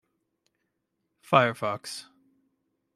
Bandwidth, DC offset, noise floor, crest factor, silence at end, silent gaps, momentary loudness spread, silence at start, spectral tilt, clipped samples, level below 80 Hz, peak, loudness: 14.5 kHz; under 0.1%; -79 dBFS; 26 dB; 0.95 s; none; 17 LU; 1.3 s; -5 dB/octave; under 0.1%; -76 dBFS; -4 dBFS; -25 LUFS